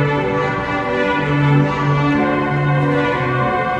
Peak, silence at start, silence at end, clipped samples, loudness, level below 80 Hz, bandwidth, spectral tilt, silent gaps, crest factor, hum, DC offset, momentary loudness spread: -2 dBFS; 0 s; 0 s; under 0.1%; -17 LUFS; -40 dBFS; 7.6 kHz; -8 dB/octave; none; 14 dB; none; under 0.1%; 4 LU